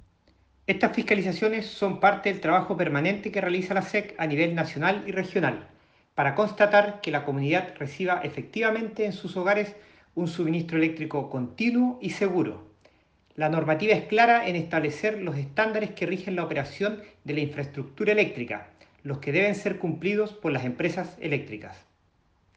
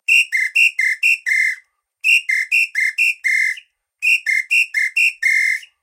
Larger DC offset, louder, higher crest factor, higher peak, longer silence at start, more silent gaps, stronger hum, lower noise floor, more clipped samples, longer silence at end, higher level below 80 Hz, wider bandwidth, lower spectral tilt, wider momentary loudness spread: neither; second, -26 LUFS vs -15 LUFS; first, 22 dB vs 14 dB; about the same, -6 dBFS vs -4 dBFS; first, 0.7 s vs 0.1 s; neither; neither; first, -66 dBFS vs -47 dBFS; neither; first, 0.8 s vs 0.15 s; first, -66 dBFS vs -86 dBFS; second, 9 kHz vs 16.5 kHz; first, -6.5 dB/octave vs 8 dB/octave; first, 11 LU vs 6 LU